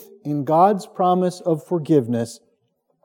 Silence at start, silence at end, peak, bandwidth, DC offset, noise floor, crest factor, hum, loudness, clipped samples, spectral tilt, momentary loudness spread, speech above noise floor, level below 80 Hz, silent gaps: 0.25 s; 0.7 s; -4 dBFS; 17 kHz; under 0.1%; -68 dBFS; 16 dB; none; -20 LUFS; under 0.1%; -7.5 dB/octave; 10 LU; 49 dB; -76 dBFS; none